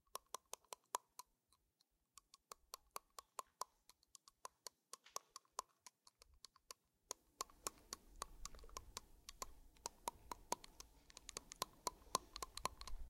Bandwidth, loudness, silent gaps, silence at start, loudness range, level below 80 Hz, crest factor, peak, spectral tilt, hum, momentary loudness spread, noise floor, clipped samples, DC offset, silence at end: 16 kHz; -53 LUFS; none; 0.15 s; 8 LU; -66 dBFS; 38 dB; -16 dBFS; -1 dB/octave; none; 17 LU; -84 dBFS; under 0.1%; under 0.1%; 0 s